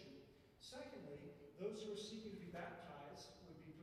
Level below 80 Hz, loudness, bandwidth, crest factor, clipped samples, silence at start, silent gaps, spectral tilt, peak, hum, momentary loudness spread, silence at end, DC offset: -78 dBFS; -54 LUFS; 14.5 kHz; 18 dB; under 0.1%; 0 s; none; -5 dB/octave; -36 dBFS; none; 11 LU; 0 s; under 0.1%